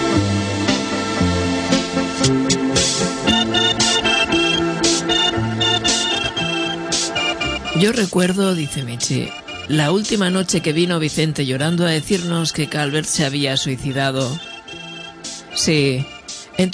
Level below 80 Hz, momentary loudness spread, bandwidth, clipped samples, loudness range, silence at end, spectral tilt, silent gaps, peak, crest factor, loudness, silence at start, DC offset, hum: -42 dBFS; 9 LU; 11 kHz; under 0.1%; 5 LU; 0 s; -3.5 dB/octave; none; -2 dBFS; 16 dB; -18 LUFS; 0 s; under 0.1%; none